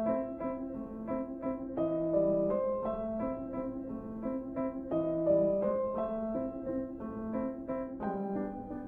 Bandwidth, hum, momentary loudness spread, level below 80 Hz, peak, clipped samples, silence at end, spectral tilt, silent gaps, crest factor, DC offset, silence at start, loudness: 3.6 kHz; none; 10 LU; -56 dBFS; -18 dBFS; under 0.1%; 0 s; -11 dB/octave; none; 16 dB; under 0.1%; 0 s; -35 LUFS